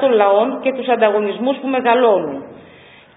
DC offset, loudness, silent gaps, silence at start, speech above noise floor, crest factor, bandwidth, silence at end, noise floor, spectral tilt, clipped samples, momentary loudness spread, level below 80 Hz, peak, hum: under 0.1%; -16 LUFS; none; 0 s; 28 dB; 14 dB; 4 kHz; 0.6 s; -44 dBFS; -10 dB/octave; under 0.1%; 7 LU; -66 dBFS; -2 dBFS; none